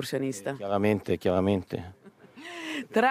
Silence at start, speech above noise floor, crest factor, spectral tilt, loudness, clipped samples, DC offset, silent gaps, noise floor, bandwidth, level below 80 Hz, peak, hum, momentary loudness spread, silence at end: 0 s; 21 dB; 16 dB; -6 dB/octave; -29 LUFS; under 0.1%; under 0.1%; none; -48 dBFS; 16 kHz; -66 dBFS; -12 dBFS; none; 15 LU; 0 s